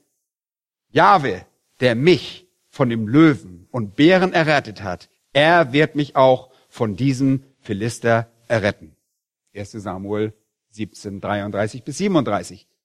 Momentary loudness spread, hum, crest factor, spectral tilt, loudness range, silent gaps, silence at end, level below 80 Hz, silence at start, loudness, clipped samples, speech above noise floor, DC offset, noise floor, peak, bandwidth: 16 LU; none; 18 dB; -6 dB/octave; 8 LU; none; 0.3 s; -56 dBFS; 0.95 s; -18 LUFS; under 0.1%; over 72 dB; under 0.1%; under -90 dBFS; 0 dBFS; 12.5 kHz